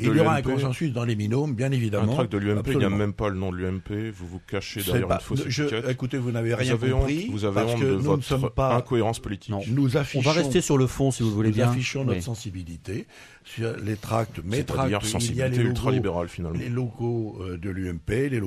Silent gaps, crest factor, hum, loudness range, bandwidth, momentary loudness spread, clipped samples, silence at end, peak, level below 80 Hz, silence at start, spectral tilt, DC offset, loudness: none; 18 dB; none; 4 LU; 14.5 kHz; 10 LU; under 0.1%; 0 s; -6 dBFS; -42 dBFS; 0 s; -6 dB/octave; under 0.1%; -25 LUFS